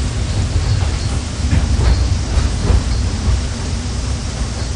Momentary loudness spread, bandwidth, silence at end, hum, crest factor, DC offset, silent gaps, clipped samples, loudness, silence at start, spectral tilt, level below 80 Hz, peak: 6 LU; 10.5 kHz; 0 s; none; 14 dB; under 0.1%; none; under 0.1%; -18 LUFS; 0 s; -5 dB/octave; -18 dBFS; -2 dBFS